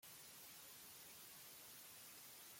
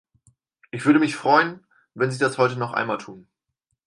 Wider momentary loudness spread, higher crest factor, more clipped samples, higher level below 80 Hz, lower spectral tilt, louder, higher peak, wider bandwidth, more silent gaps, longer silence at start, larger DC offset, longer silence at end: second, 0 LU vs 11 LU; second, 14 dB vs 20 dB; neither; second, -90 dBFS vs -72 dBFS; second, -0.5 dB/octave vs -5.5 dB/octave; second, -57 LUFS vs -22 LUFS; second, -46 dBFS vs -4 dBFS; first, 16.5 kHz vs 11.5 kHz; neither; second, 0 s vs 0.75 s; neither; second, 0 s vs 0.65 s